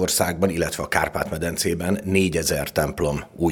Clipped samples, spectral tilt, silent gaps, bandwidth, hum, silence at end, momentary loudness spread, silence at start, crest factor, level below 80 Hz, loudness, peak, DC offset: under 0.1%; -4 dB/octave; none; over 20 kHz; none; 0 s; 5 LU; 0 s; 20 dB; -42 dBFS; -23 LUFS; -2 dBFS; under 0.1%